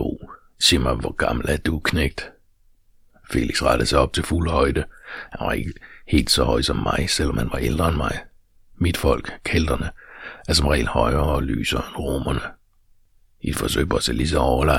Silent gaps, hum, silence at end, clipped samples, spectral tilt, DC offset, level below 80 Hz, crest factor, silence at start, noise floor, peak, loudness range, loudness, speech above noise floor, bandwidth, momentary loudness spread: none; none; 0 s; under 0.1%; -4.5 dB/octave; under 0.1%; -30 dBFS; 20 dB; 0 s; -56 dBFS; -2 dBFS; 2 LU; -21 LUFS; 35 dB; 16.5 kHz; 14 LU